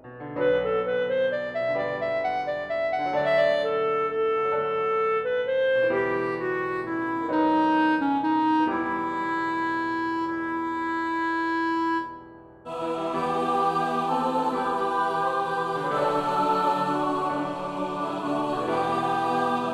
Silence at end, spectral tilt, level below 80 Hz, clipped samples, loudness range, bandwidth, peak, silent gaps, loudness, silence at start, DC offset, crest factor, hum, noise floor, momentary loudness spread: 0 s; -6 dB/octave; -62 dBFS; under 0.1%; 3 LU; 12 kHz; -12 dBFS; none; -25 LUFS; 0.05 s; under 0.1%; 14 dB; none; -46 dBFS; 6 LU